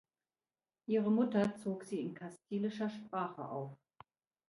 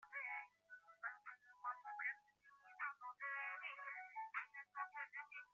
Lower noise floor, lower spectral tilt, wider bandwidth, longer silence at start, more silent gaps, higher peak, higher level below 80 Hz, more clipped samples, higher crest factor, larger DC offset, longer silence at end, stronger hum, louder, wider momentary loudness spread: first, under -90 dBFS vs -71 dBFS; first, -7.5 dB/octave vs 4.5 dB/octave; first, 11.5 kHz vs 7.2 kHz; first, 0.9 s vs 0 s; neither; first, -20 dBFS vs -34 dBFS; first, -80 dBFS vs under -90 dBFS; neither; about the same, 18 dB vs 18 dB; neither; first, 0.75 s vs 0.05 s; second, none vs 50 Hz at -105 dBFS; first, -37 LUFS vs -50 LUFS; about the same, 13 LU vs 13 LU